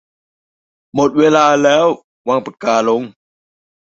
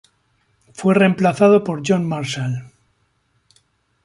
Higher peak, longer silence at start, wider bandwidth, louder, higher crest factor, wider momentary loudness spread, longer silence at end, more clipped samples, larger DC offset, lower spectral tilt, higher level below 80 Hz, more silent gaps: about the same, 0 dBFS vs -2 dBFS; first, 0.95 s vs 0.8 s; second, 8 kHz vs 11.5 kHz; first, -14 LUFS vs -17 LUFS; about the same, 14 dB vs 18 dB; about the same, 11 LU vs 10 LU; second, 0.75 s vs 1.4 s; neither; neither; second, -4.5 dB/octave vs -6.5 dB/octave; about the same, -58 dBFS vs -60 dBFS; first, 2.04-2.25 s vs none